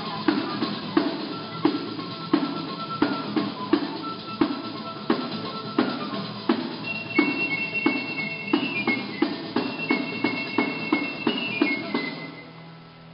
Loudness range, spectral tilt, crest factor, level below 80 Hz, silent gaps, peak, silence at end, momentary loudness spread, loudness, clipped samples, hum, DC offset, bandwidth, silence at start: 2 LU; -3 dB/octave; 24 dB; -68 dBFS; none; -4 dBFS; 0 s; 8 LU; -26 LUFS; under 0.1%; none; under 0.1%; 5.8 kHz; 0 s